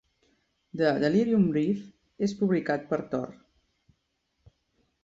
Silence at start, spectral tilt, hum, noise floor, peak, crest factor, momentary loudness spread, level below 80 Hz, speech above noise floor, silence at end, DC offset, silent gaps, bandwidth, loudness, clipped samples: 0.75 s; -7.5 dB/octave; none; -77 dBFS; -10 dBFS; 18 dB; 11 LU; -64 dBFS; 51 dB; 1.7 s; under 0.1%; none; 7.6 kHz; -27 LUFS; under 0.1%